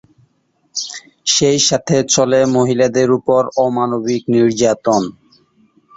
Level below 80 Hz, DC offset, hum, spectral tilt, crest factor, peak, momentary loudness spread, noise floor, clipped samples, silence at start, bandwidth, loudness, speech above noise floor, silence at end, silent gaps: -54 dBFS; under 0.1%; none; -4 dB/octave; 16 dB; 0 dBFS; 11 LU; -61 dBFS; under 0.1%; 0.75 s; 8 kHz; -14 LUFS; 47 dB; 0.85 s; none